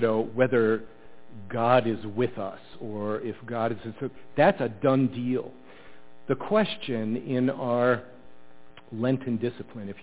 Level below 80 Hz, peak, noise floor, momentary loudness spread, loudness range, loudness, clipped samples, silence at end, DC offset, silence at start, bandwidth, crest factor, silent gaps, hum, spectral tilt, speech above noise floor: -62 dBFS; -6 dBFS; -53 dBFS; 14 LU; 2 LU; -27 LUFS; under 0.1%; 0 s; 0.6%; 0 s; 4 kHz; 22 dB; none; none; -10.5 dB/octave; 26 dB